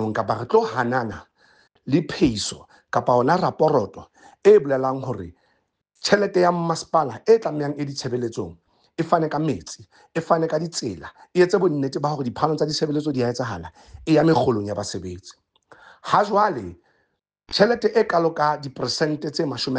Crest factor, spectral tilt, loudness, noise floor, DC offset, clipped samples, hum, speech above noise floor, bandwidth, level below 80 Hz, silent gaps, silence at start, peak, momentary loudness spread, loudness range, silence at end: 18 dB; -5.5 dB/octave; -22 LUFS; -71 dBFS; under 0.1%; under 0.1%; none; 50 dB; 9.8 kHz; -54 dBFS; none; 0 s; -4 dBFS; 15 LU; 3 LU; 0 s